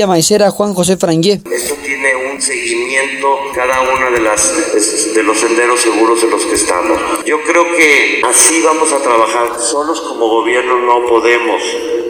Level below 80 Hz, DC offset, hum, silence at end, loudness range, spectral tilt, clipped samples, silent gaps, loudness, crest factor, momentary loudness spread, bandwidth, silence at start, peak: -46 dBFS; under 0.1%; none; 0 s; 4 LU; -2.5 dB/octave; 0.1%; none; -11 LUFS; 12 dB; 7 LU; over 20 kHz; 0 s; 0 dBFS